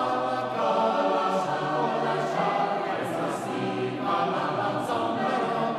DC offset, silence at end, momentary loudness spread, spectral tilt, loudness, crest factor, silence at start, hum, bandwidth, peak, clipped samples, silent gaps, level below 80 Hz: under 0.1%; 0 s; 5 LU; -5.5 dB/octave; -27 LUFS; 14 dB; 0 s; none; 14 kHz; -12 dBFS; under 0.1%; none; -70 dBFS